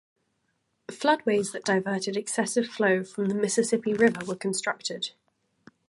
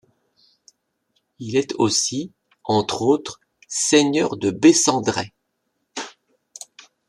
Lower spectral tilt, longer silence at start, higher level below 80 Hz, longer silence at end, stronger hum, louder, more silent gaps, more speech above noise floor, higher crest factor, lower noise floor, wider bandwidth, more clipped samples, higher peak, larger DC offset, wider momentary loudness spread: about the same, -4 dB/octave vs -3.5 dB/octave; second, 0.9 s vs 1.4 s; second, -72 dBFS vs -64 dBFS; second, 0.8 s vs 1 s; neither; second, -26 LUFS vs -19 LUFS; neither; second, 49 dB vs 55 dB; about the same, 20 dB vs 20 dB; about the same, -75 dBFS vs -74 dBFS; second, 11.5 kHz vs 13 kHz; neither; second, -8 dBFS vs -2 dBFS; neither; second, 8 LU vs 21 LU